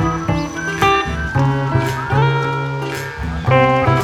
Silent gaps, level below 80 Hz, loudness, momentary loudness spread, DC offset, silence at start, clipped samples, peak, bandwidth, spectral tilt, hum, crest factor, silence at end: none; -32 dBFS; -17 LUFS; 9 LU; under 0.1%; 0 s; under 0.1%; 0 dBFS; 12.5 kHz; -6 dB/octave; none; 16 dB; 0 s